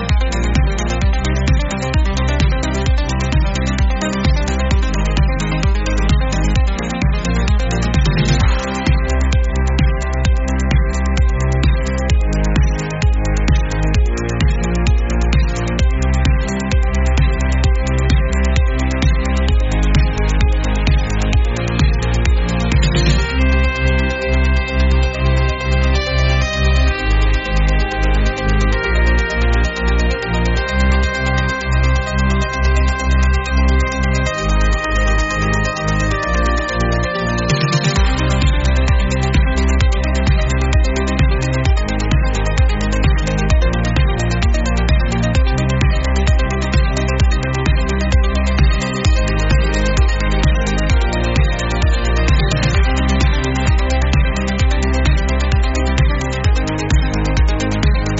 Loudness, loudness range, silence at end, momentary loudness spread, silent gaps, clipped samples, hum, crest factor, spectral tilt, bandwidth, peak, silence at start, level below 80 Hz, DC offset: -16 LUFS; 1 LU; 0 s; 2 LU; none; under 0.1%; none; 12 dB; -5.5 dB/octave; 8 kHz; -2 dBFS; 0 s; -16 dBFS; under 0.1%